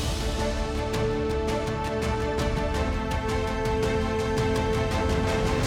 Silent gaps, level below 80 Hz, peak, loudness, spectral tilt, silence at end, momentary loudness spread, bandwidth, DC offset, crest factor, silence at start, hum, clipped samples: none; -32 dBFS; -12 dBFS; -27 LUFS; -5.5 dB/octave; 0 s; 3 LU; 16.5 kHz; under 0.1%; 12 dB; 0 s; none; under 0.1%